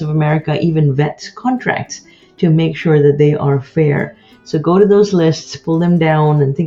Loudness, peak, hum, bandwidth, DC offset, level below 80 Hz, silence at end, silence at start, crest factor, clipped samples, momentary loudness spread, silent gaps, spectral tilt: -14 LUFS; 0 dBFS; none; 7.4 kHz; under 0.1%; -48 dBFS; 0 s; 0 s; 12 dB; under 0.1%; 11 LU; none; -7.5 dB/octave